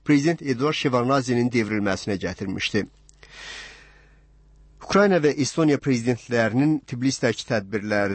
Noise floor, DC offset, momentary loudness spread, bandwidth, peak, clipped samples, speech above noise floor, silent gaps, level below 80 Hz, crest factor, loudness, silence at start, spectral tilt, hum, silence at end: -53 dBFS; under 0.1%; 12 LU; 8.8 kHz; -8 dBFS; under 0.1%; 31 dB; none; -54 dBFS; 16 dB; -23 LUFS; 0.05 s; -5.5 dB/octave; none; 0 s